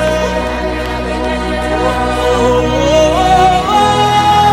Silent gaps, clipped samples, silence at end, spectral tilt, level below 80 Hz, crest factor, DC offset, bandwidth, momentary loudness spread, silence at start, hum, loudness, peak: none; under 0.1%; 0 s; -5 dB/octave; -24 dBFS; 10 dB; under 0.1%; 16.5 kHz; 8 LU; 0 s; none; -12 LUFS; 0 dBFS